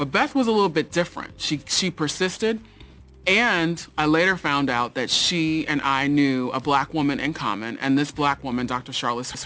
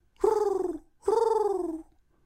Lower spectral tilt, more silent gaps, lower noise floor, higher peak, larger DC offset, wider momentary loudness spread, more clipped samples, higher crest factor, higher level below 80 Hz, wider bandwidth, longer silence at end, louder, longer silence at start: about the same, -4 dB/octave vs -5 dB/octave; neither; about the same, -46 dBFS vs -47 dBFS; first, -6 dBFS vs -12 dBFS; neither; about the same, 8 LU vs 10 LU; neither; about the same, 18 dB vs 16 dB; first, -52 dBFS vs -58 dBFS; second, 8 kHz vs 13.5 kHz; second, 0 s vs 0.45 s; first, -22 LUFS vs -28 LUFS; second, 0 s vs 0.2 s